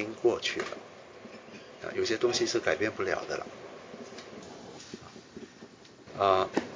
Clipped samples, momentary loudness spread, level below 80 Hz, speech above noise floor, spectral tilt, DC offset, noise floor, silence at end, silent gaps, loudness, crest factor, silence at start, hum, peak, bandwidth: under 0.1%; 21 LU; -64 dBFS; 22 dB; -3.5 dB/octave; under 0.1%; -52 dBFS; 0 s; none; -30 LUFS; 24 dB; 0 s; none; -10 dBFS; 7.6 kHz